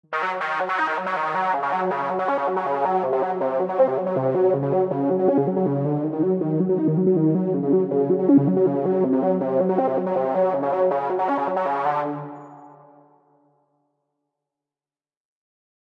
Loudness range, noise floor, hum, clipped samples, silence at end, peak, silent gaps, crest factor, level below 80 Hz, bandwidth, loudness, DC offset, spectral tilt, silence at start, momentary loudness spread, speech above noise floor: 7 LU; under -90 dBFS; none; under 0.1%; 3.1 s; -6 dBFS; none; 16 dB; -74 dBFS; 6 kHz; -22 LUFS; under 0.1%; -9.5 dB/octave; 0.1 s; 4 LU; over 67 dB